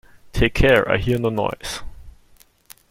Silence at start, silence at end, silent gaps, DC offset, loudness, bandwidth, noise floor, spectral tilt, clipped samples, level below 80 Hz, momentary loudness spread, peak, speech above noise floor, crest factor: 0.25 s; 0.8 s; none; under 0.1%; -19 LUFS; 16.5 kHz; -53 dBFS; -5.5 dB/octave; under 0.1%; -32 dBFS; 15 LU; -2 dBFS; 35 dB; 18 dB